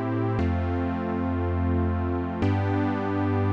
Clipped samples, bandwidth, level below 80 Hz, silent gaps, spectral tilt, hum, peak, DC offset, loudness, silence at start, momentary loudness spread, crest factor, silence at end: under 0.1%; 5.8 kHz; -40 dBFS; none; -9.5 dB/octave; none; -12 dBFS; 0.2%; -26 LUFS; 0 s; 3 LU; 12 dB; 0 s